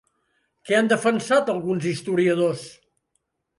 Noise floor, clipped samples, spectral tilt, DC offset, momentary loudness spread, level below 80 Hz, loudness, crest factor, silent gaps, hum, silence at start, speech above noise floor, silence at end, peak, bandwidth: -74 dBFS; under 0.1%; -5.5 dB/octave; under 0.1%; 6 LU; -68 dBFS; -22 LUFS; 18 dB; none; none; 0.65 s; 53 dB; 0.85 s; -6 dBFS; 11.5 kHz